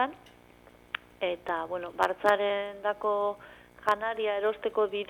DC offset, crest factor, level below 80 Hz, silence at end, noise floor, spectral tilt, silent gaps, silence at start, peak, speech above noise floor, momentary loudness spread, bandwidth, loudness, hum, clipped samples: under 0.1%; 24 dB; -66 dBFS; 0.05 s; -56 dBFS; -4 dB/octave; none; 0 s; -6 dBFS; 27 dB; 10 LU; 17.5 kHz; -30 LUFS; 60 Hz at -65 dBFS; under 0.1%